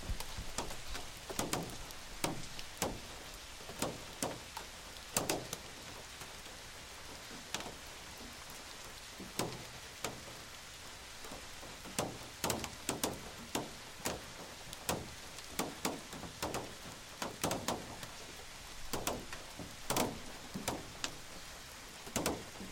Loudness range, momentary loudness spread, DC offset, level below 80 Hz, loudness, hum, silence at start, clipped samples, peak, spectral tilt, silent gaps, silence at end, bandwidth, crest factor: 4 LU; 10 LU; under 0.1%; -56 dBFS; -42 LUFS; none; 0 s; under 0.1%; -16 dBFS; -3 dB/octave; none; 0 s; 17 kHz; 28 dB